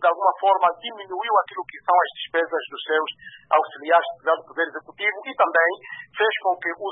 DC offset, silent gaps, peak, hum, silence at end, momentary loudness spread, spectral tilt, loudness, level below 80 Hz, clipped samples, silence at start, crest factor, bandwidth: under 0.1%; none; -4 dBFS; none; 0 s; 11 LU; -6.5 dB/octave; -22 LUFS; -76 dBFS; under 0.1%; 0 s; 18 dB; 4 kHz